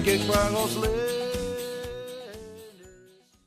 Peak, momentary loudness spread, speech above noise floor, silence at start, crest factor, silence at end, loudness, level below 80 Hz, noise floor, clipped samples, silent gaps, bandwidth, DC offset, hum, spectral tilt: -8 dBFS; 21 LU; 32 dB; 0 s; 20 dB; 0.55 s; -27 LUFS; -42 dBFS; -56 dBFS; under 0.1%; none; 15 kHz; under 0.1%; none; -4 dB/octave